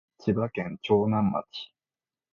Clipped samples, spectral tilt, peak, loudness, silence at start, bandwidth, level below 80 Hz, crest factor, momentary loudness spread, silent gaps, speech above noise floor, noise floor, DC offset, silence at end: under 0.1%; -8.5 dB/octave; -10 dBFS; -27 LUFS; 0.25 s; 6.8 kHz; -58 dBFS; 18 dB; 17 LU; none; over 63 dB; under -90 dBFS; under 0.1%; 0.65 s